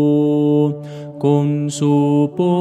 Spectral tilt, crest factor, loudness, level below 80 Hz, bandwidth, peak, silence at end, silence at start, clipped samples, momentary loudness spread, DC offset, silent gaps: -8 dB/octave; 14 dB; -16 LUFS; -66 dBFS; 10.5 kHz; -2 dBFS; 0 s; 0 s; under 0.1%; 6 LU; under 0.1%; none